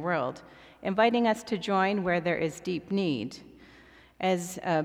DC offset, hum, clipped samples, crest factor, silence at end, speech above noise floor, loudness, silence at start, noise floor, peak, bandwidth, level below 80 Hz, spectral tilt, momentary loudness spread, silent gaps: under 0.1%; none; under 0.1%; 18 dB; 0 s; 27 dB; -29 LUFS; 0 s; -55 dBFS; -10 dBFS; 15.5 kHz; -64 dBFS; -5.5 dB/octave; 11 LU; none